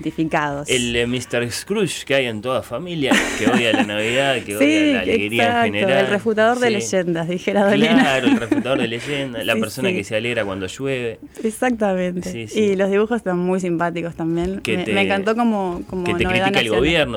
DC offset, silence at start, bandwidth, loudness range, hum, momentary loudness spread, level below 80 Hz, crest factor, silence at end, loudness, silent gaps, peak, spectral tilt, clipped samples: under 0.1%; 0 s; 18.5 kHz; 5 LU; none; 8 LU; -44 dBFS; 14 dB; 0 s; -19 LUFS; none; -6 dBFS; -4.5 dB/octave; under 0.1%